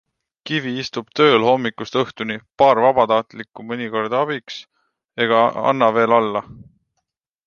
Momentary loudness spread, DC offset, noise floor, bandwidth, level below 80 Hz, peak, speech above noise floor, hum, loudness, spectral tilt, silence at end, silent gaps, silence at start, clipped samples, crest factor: 15 LU; under 0.1%; -76 dBFS; 7 kHz; -60 dBFS; 0 dBFS; 58 dB; none; -18 LUFS; -5.5 dB/octave; 0.85 s; none; 0.45 s; under 0.1%; 18 dB